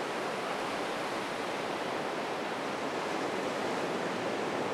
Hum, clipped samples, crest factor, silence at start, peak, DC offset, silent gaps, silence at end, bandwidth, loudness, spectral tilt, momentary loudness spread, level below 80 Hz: none; under 0.1%; 14 dB; 0 s; -20 dBFS; under 0.1%; none; 0 s; 17.5 kHz; -34 LUFS; -4 dB/octave; 2 LU; -72 dBFS